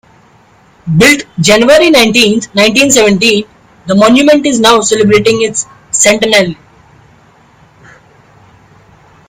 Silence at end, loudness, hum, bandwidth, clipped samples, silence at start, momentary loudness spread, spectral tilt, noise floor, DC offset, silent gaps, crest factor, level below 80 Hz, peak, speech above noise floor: 2.75 s; -7 LUFS; none; over 20 kHz; 1%; 0.85 s; 9 LU; -3.5 dB/octave; -44 dBFS; under 0.1%; none; 10 dB; -42 dBFS; 0 dBFS; 37 dB